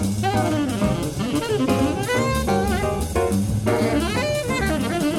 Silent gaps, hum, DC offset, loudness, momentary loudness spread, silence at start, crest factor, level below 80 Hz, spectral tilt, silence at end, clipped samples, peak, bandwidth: none; none; under 0.1%; -22 LUFS; 2 LU; 0 s; 14 dB; -34 dBFS; -5.5 dB/octave; 0 s; under 0.1%; -6 dBFS; 17 kHz